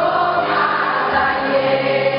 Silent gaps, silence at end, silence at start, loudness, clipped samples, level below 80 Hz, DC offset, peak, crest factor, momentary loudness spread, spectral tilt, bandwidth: none; 0 s; 0 s; -17 LUFS; under 0.1%; -50 dBFS; under 0.1%; -4 dBFS; 14 dB; 1 LU; -8 dB/octave; 5.4 kHz